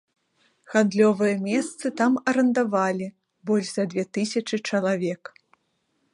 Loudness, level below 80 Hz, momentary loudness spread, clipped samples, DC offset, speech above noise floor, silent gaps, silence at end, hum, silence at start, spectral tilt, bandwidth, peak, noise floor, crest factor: -24 LUFS; -72 dBFS; 10 LU; under 0.1%; under 0.1%; 49 dB; none; 1 s; none; 0.7 s; -5.5 dB/octave; 11 kHz; -6 dBFS; -72 dBFS; 20 dB